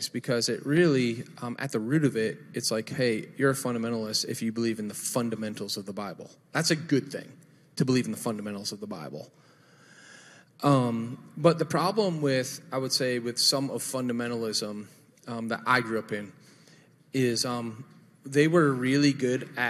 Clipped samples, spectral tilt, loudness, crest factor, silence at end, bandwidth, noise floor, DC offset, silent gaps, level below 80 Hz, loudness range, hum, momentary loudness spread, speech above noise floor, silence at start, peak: under 0.1%; -4.5 dB/octave; -28 LUFS; 22 dB; 0 s; 15 kHz; -57 dBFS; under 0.1%; none; -72 dBFS; 5 LU; none; 14 LU; 30 dB; 0 s; -6 dBFS